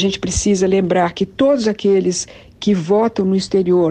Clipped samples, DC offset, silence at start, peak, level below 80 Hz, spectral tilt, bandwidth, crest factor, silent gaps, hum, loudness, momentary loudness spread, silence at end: under 0.1%; under 0.1%; 0 s; -4 dBFS; -38 dBFS; -5 dB/octave; 10 kHz; 12 dB; none; none; -16 LUFS; 5 LU; 0 s